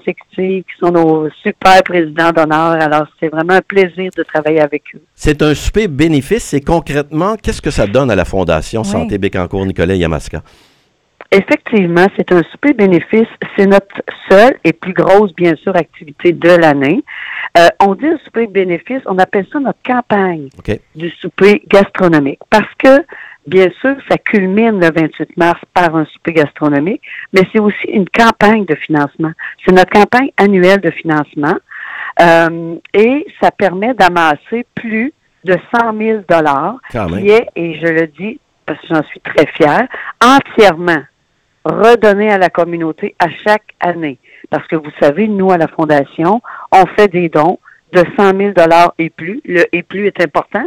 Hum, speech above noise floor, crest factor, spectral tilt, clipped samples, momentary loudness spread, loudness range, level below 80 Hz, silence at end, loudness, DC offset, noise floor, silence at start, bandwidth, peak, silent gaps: none; 48 dB; 12 dB; -6 dB/octave; 0.7%; 11 LU; 4 LU; -36 dBFS; 0 s; -11 LUFS; under 0.1%; -59 dBFS; 0.05 s; 16.5 kHz; 0 dBFS; none